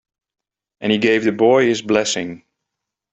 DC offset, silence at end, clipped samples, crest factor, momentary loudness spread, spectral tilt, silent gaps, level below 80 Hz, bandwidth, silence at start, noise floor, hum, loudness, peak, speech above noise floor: under 0.1%; 0.75 s; under 0.1%; 18 dB; 11 LU; -4 dB/octave; none; -60 dBFS; 8.2 kHz; 0.8 s; -81 dBFS; none; -17 LUFS; 0 dBFS; 65 dB